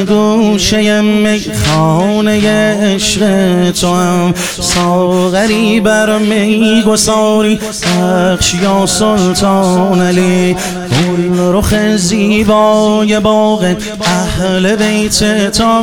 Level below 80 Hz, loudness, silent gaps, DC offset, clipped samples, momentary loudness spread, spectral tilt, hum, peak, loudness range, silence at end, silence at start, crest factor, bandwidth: -32 dBFS; -10 LUFS; none; 1%; under 0.1%; 4 LU; -4.5 dB/octave; none; 0 dBFS; 1 LU; 0 s; 0 s; 10 dB; 17.5 kHz